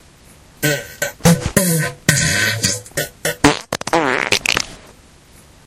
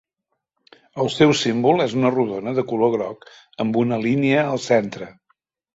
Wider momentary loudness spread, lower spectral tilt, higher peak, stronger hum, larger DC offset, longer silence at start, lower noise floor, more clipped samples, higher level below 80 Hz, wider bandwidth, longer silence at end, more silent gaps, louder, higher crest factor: second, 8 LU vs 14 LU; second, -3.5 dB/octave vs -5.5 dB/octave; about the same, 0 dBFS vs -2 dBFS; neither; neither; second, 0.6 s vs 0.95 s; second, -45 dBFS vs -78 dBFS; neither; first, -40 dBFS vs -60 dBFS; first, 17 kHz vs 8 kHz; first, 0.9 s vs 0.65 s; neither; first, -17 LUFS vs -20 LUFS; about the same, 18 dB vs 20 dB